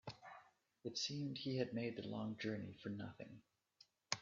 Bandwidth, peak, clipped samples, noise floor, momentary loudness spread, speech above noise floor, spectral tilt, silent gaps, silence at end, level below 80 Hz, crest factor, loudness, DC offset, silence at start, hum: 7.4 kHz; -20 dBFS; under 0.1%; -73 dBFS; 15 LU; 28 dB; -4.5 dB/octave; none; 0 s; -82 dBFS; 28 dB; -46 LUFS; under 0.1%; 0.05 s; none